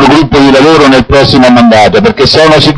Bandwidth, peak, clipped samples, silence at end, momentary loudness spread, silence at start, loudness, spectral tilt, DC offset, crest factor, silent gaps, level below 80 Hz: 11 kHz; 0 dBFS; 10%; 0 s; 2 LU; 0 s; -3 LUFS; -5.5 dB/octave; under 0.1%; 4 dB; none; -24 dBFS